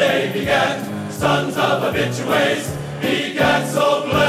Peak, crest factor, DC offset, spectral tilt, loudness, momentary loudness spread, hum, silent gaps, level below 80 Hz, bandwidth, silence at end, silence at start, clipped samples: -4 dBFS; 16 dB; under 0.1%; -4.5 dB/octave; -19 LUFS; 6 LU; none; none; -46 dBFS; 16 kHz; 0 s; 0 s; under 0.1%